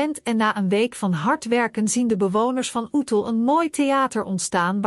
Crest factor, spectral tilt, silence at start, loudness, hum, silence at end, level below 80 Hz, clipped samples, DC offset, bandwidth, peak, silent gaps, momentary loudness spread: 14 dB; -4.5 dB/octave; 0 s; -21 LUFS; none; 0 s; -64 dBFS; under 0.1%; under 0.1%; 13.5 kHz; -8 dBFS; none; 3 LU